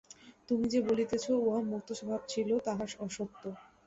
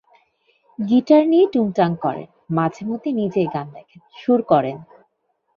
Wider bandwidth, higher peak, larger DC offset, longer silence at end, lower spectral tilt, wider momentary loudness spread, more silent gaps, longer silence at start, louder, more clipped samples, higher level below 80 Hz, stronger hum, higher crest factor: first, 8 kHz vs 7 kHz; second, -18 dBFS vs -2 dBFS; neither; second, 0.25 s vs 0.75 s; second, -5 dB/octave vs -8.5 dB/octave; second, 11 LU vs 15 LU; neither; second, 0.1 s vs 0.8 s; second, -34 LUFS vs -19 LUFS; neither; about the same, -66 dBFS vs -64 dBFS; neither; about the same, 16 dB vs 18 dB